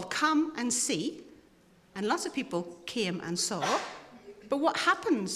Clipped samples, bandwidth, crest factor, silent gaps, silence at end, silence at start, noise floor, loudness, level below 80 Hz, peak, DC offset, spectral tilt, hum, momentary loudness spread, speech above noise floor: under 0.1%; 15 kHz; 20 dB; none; 0 s; 0 s; -61 dBFS; -30 LUFS; -72 dBFS; -12 dBFS; under 0.1%; -3 dB/octave; none; 17 LU; 31 dB